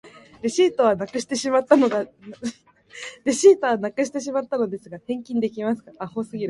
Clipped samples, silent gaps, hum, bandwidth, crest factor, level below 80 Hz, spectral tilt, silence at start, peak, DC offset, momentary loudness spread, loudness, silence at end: under 0.1%; none; none; 11.5 kHz; 20 dB; -66 dBFS; -4.5 dB/octave; 0.05 s; -2 dBFS; under 0.1%; 17 LU; -22 LUFS; 0 s